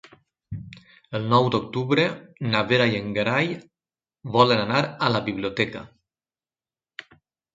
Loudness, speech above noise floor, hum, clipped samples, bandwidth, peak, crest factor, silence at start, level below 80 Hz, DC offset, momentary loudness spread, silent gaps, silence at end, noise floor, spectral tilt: -23 LUFS; over 67 dB; none; under 0.1%; 7.8 kHz; -2 dBFS; 22 dB; 0.5 s; -58 dBFS; under 0.1%; 21 LU; none; 1.65 s; under -90 dBFS; -6.5 dB/octave